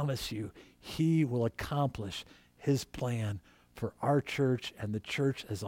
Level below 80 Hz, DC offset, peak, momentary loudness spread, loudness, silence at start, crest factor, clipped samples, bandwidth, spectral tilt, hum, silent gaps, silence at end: -58 dBFS; under 0.1%; -16 dBFS; 14 LU; -34 LUFS; 0 s; 16 dB; under 0.1%; 16.5 kHz; -6.5 dB/octave; none; none; 0 s